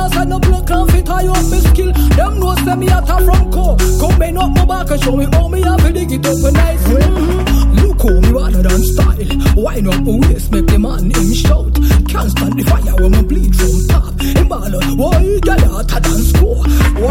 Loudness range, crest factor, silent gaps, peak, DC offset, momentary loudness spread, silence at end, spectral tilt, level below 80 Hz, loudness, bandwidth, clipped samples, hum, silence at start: 1 LU; 10 dB; none; 0 dBFS; under 0.1%; 3 LU; 0 s; -6 dB/octave; -12 dBFS; -13 LUFS; 16.5 kHz; under 0.1%; none; 0 s